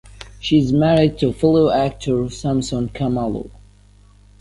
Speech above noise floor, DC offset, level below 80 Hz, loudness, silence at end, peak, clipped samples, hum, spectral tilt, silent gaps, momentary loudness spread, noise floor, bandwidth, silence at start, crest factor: 31 dB; under 0.1%; -40 dBFS; -18 LUFS; 0.95 s; -2 dBFS; under 0.1%; 50 Hz at -35 dBFS; -7 dB/octave; none; 10 LU; -48 dBFS; 11.5 kHz; 0.2 s; 16 dB